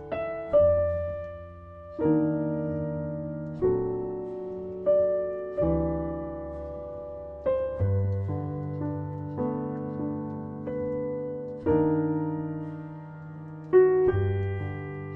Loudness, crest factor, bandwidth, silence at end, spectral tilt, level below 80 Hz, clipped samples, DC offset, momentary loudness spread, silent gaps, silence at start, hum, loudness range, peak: -28 LUFS; 18 dB; 3.6 kHz; 0 s; -11.5 dB/octave; -48 dBFS; under 0.1%; under 0.1%; 15 LU; none; 0 s; none; 5 LU; -10 dBFS